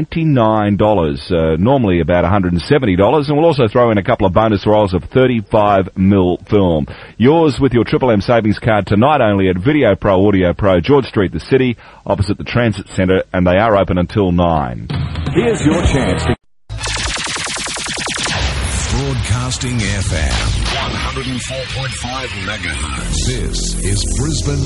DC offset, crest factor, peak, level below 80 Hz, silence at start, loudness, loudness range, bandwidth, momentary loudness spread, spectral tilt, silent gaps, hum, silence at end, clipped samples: under 0.1%; 14 dB; 0 dBFS; -28 dBFS; 0 s; -15 LUFS; 6 LU; 11.5 kHz; 8 LU; -5.5 dB/octave; none; none; 0 s; under 0.1%